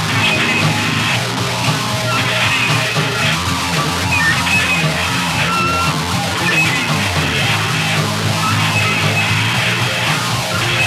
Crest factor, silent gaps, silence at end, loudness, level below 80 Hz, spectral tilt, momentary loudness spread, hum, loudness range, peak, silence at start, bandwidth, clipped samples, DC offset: 14 dB; none; 0 s; -14 LUFS; -42 dBFS; -3.5 dB/octave; 3 LU; none; 1 LU; -2 dBFS; 0 s; 16.5 kHz; under 0.1%; under 0.1%